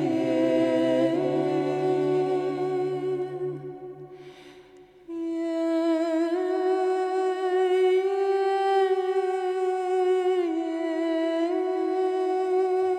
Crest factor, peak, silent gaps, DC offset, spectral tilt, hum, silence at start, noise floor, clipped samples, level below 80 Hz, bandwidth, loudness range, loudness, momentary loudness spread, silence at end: 12 dB; -12 dBFS; none; under 0.1%; -6.5 dB/octave; none; 0 s; -51 dBFS; under 0.1%; -72 dBFS; 9.4 kHz; 6 LU; -25 LUFS; 9 LU; 0 s